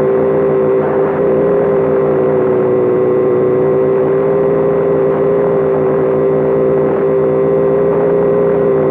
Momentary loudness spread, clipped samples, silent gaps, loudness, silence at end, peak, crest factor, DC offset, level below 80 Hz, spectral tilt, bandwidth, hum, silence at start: 1 LU; under 0.1%; none; -12 LUFS; 0 s; -2 dBFS; 8 dB; under 0.1%; -46 dBFS; -11 dB/octave; 3.7 kHz; none; 0 s